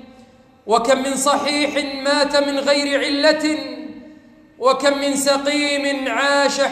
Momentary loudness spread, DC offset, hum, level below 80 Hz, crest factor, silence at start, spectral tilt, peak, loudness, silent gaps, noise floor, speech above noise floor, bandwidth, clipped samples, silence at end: 6 LU; under 0.1%; none; -58 dBFS; 16 dB; 0.1 s; -2 dB/octave; -4 dBFS; -18 LUFS; none; -48 dBFS; 30 dB; 15.5 kHz; under 0.1%; 0 s